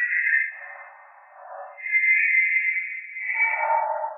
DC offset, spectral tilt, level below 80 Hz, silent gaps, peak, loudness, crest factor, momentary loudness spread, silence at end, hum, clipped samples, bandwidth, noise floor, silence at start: under 0.1%; 0.5 dB/octave; under -90 dBFS; none; -10 dBFS; -21 LUFS; 14 dB; 22 LU; 0 s; none; under 0.1%; 3 kHz; -48 dBFS; 0 s